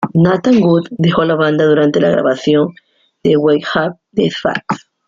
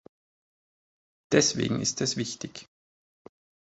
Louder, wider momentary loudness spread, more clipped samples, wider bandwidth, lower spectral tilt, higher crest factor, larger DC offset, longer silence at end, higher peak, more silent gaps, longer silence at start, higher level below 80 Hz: first, -13 LUFS vs -26 LUFS; second, 8 LU vs 16 LU; neither; second, 7.4 kHz vs 8.4 kHz; first, -7 dB/octave vs -3.5 dB/octave; second, 12 dB vs 26 dB; neither; second, 0.3 s vs 1.05 s; first, -2 dBFS vs -6 dBFS; neither; second, 0 s vs 1.3 s; first, -50 dBFS vs -62 dBFS